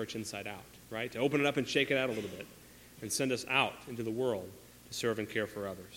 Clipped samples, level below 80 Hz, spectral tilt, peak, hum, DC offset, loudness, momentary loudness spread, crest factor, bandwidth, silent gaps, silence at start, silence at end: under 0.1%; -68 dBFS; -4 dB/octave; -12 dBFS; none; under 0.1%; -34 LUFS; 18 LU; 22 dB; 16.5 kHz; none; 0 s; 0 s